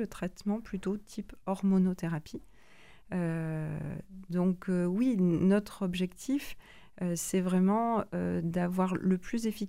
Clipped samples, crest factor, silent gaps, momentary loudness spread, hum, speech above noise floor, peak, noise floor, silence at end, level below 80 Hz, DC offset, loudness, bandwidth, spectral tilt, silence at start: under 0.1%; 16 dB; none; 12 LU; none; 28 dB; -14 dBFS; -59 dBFS; 0 s; -56 dBFS; 0.2%; -32 LUFS; 16 kHz; -7 dB/octave; 0 s